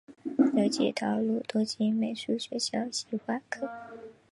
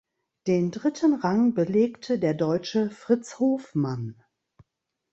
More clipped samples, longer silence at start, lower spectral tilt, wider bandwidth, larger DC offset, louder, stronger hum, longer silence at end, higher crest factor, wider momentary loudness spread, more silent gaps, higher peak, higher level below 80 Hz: neither; second, 0.1 s vs 0.45 s; second, -4.5 dB/octave vs -7 dB/octave; first, 11.5 kHz vs 8.2 kHz; neither; second, -30 LUFS vs -25 LUFS; neither; second, 0.2 s vs 1 s; about the same, 20 dB vs 18 dB; first, 11 LU vs 6 LU; neither; about the same, -10 dBFS vs -8 dBFS; second, -76 dBFS vs -66 dBFS